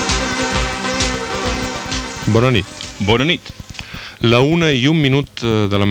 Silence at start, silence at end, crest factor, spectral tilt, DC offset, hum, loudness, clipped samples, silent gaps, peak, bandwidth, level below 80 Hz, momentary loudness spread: 0 s; 0 s; 16 dB; -5 dB/octave; under 0.1%; none; -16 LUFS; under 0.1%; none; 0 dBFS; 17 kHz; -32 dBFS; 12 LU